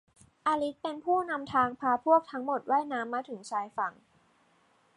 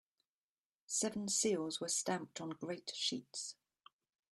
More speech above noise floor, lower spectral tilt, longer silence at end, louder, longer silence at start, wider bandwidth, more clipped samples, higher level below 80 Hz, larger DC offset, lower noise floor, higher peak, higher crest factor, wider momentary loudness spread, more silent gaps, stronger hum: second, 37 dB vs over 50 dB; first, -5 dB/octave vs -2.5 dB/octave; first, 1.05 s vs 0.8 s; first, -30 LUFS vs -39 LUFS; second, 0.45 s vs 0.9 s; second, 11.5 kHz vs 13 kHz; neither; first, -72 dBFS vs -82 dBFS; neither; second, -67 dBFS vs under -90 dBFS; first, -12 dBFS vs -22 dBFS; about the same, 20 dB vs 20 dB; about the same, 10 LU vs 11 LU; neither; neither